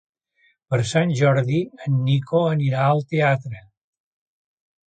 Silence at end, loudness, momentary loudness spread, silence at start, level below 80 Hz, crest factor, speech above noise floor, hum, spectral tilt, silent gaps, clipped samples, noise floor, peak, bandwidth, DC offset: 1.3 s; -21 LUFS; 7 LU; 0.7 s; -58 dBFS; 18 dB; 44 dB; none; -7 dB/octave; none; under 0.1%; -63 dBFS; -4 dBFS; 9.2 kHz; under 0.1%